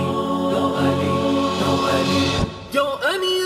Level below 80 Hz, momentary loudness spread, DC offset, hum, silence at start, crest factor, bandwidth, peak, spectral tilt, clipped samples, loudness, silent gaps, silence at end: -42 dBFS; 3 LU; under 0.1%; none; 0 s; 14 dB; 15.5 kHz; -6 dBFS; -5 dB/octave; under 0.1%; -20 LUFS; none; 0 s